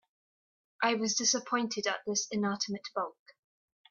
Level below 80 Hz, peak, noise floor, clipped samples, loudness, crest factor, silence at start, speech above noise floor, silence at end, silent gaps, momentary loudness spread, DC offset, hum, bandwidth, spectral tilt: -80 dBFS; -12 dBFS; under -90 dBFS; under 0.1%; -31 LUFS; 22 dB; 0.8 s; over 58 dB; 0.8 s; none; 9 LU; under 0.1%; none; 7.6 kHz; -2 dB/octave